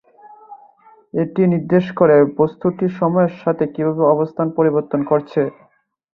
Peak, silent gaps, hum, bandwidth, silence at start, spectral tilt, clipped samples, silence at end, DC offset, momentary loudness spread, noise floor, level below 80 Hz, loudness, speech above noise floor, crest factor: -2 dBFS; none; none; 5.6 kHz; 0.5 s; -11 dB/octave; under 0.1%; 0.65 s; under 0.1%; 8 LU; -49 dBFS; -58 dBFS; -17 LUFS; 33 dB; 16 dB